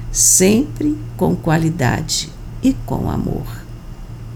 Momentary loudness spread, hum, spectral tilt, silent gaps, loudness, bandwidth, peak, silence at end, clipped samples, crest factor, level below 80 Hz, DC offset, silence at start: 22 LU; none; -4 dB/octave; none; -16 LUFS; 19.5 kHz; -2 dBFS; 0 s; under 0.1%; 16 dB; -32 dBFS; under 0.1%; 0 s